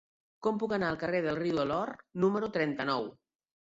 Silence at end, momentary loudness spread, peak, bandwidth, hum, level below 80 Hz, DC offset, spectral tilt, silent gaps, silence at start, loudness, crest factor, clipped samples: 0.65 s; 5 LU; -16 dBFS; 7.8 kHz; none; -66 dBFS; under 0.1%; -7 dB/octave; none; 0.4 s; -32 LUFS; 18 dB; under 0.1%